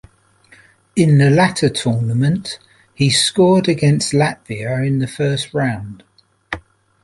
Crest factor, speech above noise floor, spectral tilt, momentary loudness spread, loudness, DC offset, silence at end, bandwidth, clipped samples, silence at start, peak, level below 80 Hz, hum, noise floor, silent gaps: 16 dB; 35 dB; -5.5 dB/octave; 17 LU; -16 LUFS; under 0.1%; 0.45 s; 11.5 kHz; under 0.1%; 0.95 s; -2 dBFS; -50 dBFS; none; -51 dBFS; none